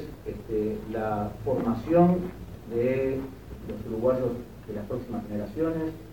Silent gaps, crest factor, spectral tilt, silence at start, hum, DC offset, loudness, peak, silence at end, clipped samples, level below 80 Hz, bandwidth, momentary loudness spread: none; 20 dB; -9 dB/octave; 0 s; none; 0.2%; -28 LUFS; -8 dBFS; 0 s; under 0.1%; -48 dBFS; 17.5 kHz; 15 LU